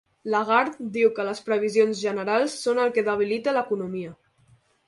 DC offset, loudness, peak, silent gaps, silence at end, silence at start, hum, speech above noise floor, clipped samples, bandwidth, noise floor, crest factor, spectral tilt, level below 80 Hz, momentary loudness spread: under 0.1%; -24 LUFS; -6 dBFS; none; 0.75 s; 0.25 s; none; 37 dB; under 0.1%; 11.5 kHz; -60 dBFS; 18 dB; -4.5 dB/octave; -70 dBFS; 8 LU